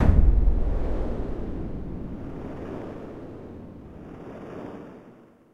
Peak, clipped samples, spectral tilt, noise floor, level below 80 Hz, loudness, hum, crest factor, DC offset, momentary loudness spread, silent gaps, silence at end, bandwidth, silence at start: -6 dBFS; under 0.1%; -10 dB/octave; -51 dBFS; -26 dBFS; -31 LUFS; none; 20 dB; under 0.1%; 19 LU; none; 0.4 s; 3.9 kHz; 0 s